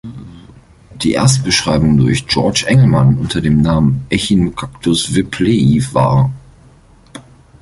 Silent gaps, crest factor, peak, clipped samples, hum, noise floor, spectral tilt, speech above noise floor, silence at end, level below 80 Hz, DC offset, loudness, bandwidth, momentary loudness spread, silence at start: none; 14 dB; 0 dBFS; under 0.1%; none; -44 dBFS; -5.5 dB/octave; 32 dB; 0.4 s; -34 dBFS; under 0.1%; -13 LUFS; 11.5 kHz; 8 LU; 0.05 s